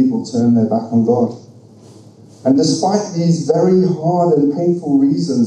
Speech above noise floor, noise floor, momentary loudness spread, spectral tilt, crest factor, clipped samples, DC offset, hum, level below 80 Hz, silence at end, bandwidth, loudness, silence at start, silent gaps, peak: 27 dB; -41 dBFS; 4 LU; -7 dB/octave; 14 dB; under 0.1%; under 0.1%; none; -64 dBFS; 0 s; 9.8 kHz; -15 LUFS; 0 s; none; -2 dBFS